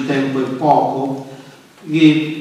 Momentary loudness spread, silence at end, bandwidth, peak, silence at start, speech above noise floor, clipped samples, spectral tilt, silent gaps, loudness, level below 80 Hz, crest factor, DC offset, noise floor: 13 LU; 0 s; 10 kHz; 0 dBFS; 0 s; 25 dB; under 0.1%; -7 dB/octave; none; -15 LUFS; -66 dBFS; 16 dB; under 0.1%; -40 dBFS